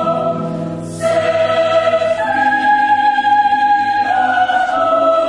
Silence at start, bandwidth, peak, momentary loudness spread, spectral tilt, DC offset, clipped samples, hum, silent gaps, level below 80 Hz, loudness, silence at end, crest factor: 0 s; 11.5 kHz; -2 dBFS; 7 LU; -5 dB/octave; under 0.1%; under 0.1%; none; none; -52 dBFS; -14 LUFS; 0 s; 12 dB